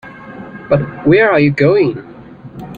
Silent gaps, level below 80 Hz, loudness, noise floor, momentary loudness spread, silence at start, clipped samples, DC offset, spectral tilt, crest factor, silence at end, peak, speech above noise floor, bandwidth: none; -48 dBFS; -12 LUFS; -33 dBFS; 22 LU; 0.05 s; under 0.1%; under 0.1%; -9 dB/octave; 14 dB; 0 s; 0 dBFS; 21 dB; 7.2 kHz